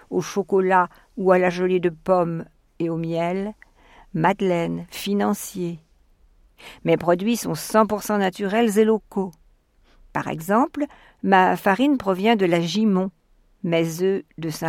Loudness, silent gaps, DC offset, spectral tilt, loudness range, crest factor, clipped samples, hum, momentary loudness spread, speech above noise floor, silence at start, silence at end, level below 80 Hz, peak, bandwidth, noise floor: -22 LUFS; none; under 0.1%; -6 dB/octave; 5 LU; 20 dB; under 0.1%; none; 11 LU; 37 dB; 0.1 s; 0 s; -56 dBFS; -2 dBFS; 17 kHz; -58 dBFS